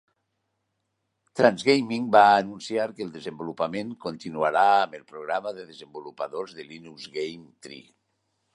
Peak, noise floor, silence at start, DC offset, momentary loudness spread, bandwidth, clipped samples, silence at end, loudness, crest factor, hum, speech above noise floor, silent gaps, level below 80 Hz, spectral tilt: -2 dBFS; -78 dBFS; 1.35 s; under 0.1%; 22 LU; 11.5 kHz; under 0.1%; 0.75 s; -24 LUFS; 24 dB; none; 53 dB; none; -72 dBFS; -5 dB/octave